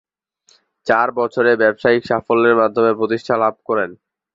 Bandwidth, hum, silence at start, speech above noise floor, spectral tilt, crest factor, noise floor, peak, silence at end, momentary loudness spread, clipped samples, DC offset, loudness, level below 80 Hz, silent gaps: 7.6 kHz; none; 0.85 s; 42 dB; -6.5 dB/octave; 16 dB; -58 dBFS; -2 dBFS; 0.4 s; 7 LU; under 0.1%; under 0.1%; -16 LUFS; -58 dBFS; none